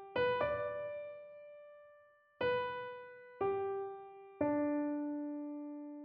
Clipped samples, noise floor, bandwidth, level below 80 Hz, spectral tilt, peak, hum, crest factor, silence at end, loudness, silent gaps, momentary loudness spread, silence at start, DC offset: under 0.1%; -65 dBFS; 5.2 kHz; -72 dBFS; -4 dB/octave; -22 dBFS; none; 18 dB; 0 s; -38 LUFS; none; 19 LU; 0 s; under 0.1%